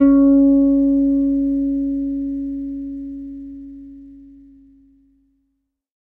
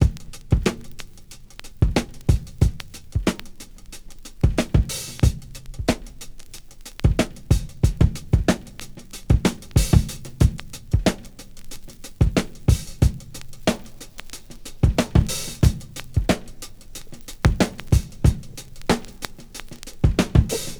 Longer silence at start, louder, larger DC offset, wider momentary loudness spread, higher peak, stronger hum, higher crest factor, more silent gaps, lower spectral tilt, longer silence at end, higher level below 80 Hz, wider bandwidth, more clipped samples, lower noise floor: about the same, 0 s vs 0 s; first, -17 LUFS vs -23 LUFS; neither; about the same, 23 LU vs 21 LU; second, -4 dBFS vs 0 dBFS; neither; second, 14 dB vs 22 dB; neither; first, -11 dB/octave vs -6 dB/octave; first, 1.85 s vs 0 s; second, -44 dBFS vs -26 dBFS; second, 2.1 kHz vs over 20 kHz; neither; first, -72 dBFS vs -41 dBFS